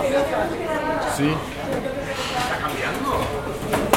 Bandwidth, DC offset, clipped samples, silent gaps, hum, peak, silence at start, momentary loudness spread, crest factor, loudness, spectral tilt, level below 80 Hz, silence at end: 16.5 kHz; under 0.1%; under 0.1%; none; none; 0 dBFS; 0 s; 5 LU; 24 dB; -24 LUFS; -4.5 dB/octave; -40 dBFS; 0 s